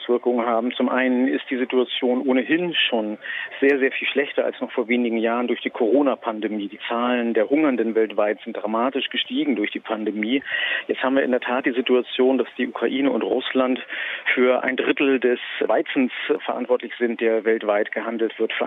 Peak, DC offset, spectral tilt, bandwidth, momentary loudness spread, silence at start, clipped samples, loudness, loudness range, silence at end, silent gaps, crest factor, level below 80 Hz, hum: -6 dBFS; under 0.1%; -7 dB/octave; 4 kHz; 6 LU; 0 s; under 0.1%; -22 LUFS; 2 LU; 0 s; none; 16 dB; -76 dBFS; none